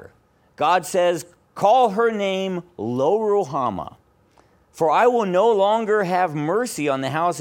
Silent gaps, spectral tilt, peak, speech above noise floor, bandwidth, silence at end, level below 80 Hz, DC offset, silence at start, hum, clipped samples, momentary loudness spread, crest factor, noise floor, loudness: none; -5 dB/octave; -4 dBFS; 38 dB; 17.5 kHz; 0 s; -62 dBFS; under 0.1%; 0 s; none; under 0.1%; 11 LU; 16 dB; -57 dBFS; -20 LUFS